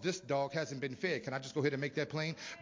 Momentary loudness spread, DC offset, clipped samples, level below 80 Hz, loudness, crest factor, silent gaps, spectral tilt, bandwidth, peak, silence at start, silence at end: 4 LU; under 0.1%; under 0.1%; -76 dBFS; -37 LUFS; 18 dB; none; -5 dB/octave; 7.6 kHz; -18 dBFS; 0 s; 0 s